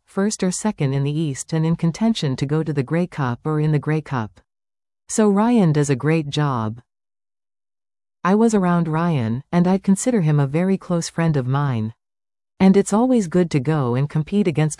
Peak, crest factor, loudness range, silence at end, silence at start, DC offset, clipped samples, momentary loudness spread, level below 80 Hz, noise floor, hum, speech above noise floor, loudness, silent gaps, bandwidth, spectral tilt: -4 dBFS; 14 dB; 3 LU; 0.05 s; 0.15 s; under 0.1%; under 0.1%; 7 LU; -52 dBFS; under -90 dBFS; none; over 71 dB; -20 LUFS; none; 12 kHz; -6.5 dB/octave